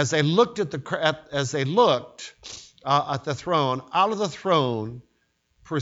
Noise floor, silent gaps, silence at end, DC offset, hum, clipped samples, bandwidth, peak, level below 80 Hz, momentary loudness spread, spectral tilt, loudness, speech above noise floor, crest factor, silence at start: -70 dBFS; none; 0 s; under 0.1%; none; under 0.1%; 8 kHz; -4 dBFS; -62 dBFS; 17 LU; -5 dB/octave; -23 LUFS; 46 dB; 22 dB; 0 s